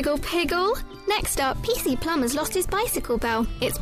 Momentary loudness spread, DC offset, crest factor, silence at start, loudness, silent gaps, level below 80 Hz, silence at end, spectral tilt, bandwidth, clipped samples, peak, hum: 3 LU; under 0.1%; 12 dB; 0 s; -25 LUFS; none; -36 dBFS; 0 s; -3.5 dB/octave; 15.5 kHz; under 0.1%; -12 dBFS; none